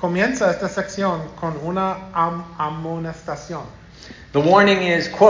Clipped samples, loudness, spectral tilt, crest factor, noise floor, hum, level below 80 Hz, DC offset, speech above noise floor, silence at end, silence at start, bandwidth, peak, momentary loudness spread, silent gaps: under 0.1%; -20 LUFS; -5.5 dB/octave; 18 dB; -41 dBFS; none; -50 dBFS; under 0.1%; 22 dB; 0 s; 0 s; 7.6 kHz; 0 dBFS; 17 LU; none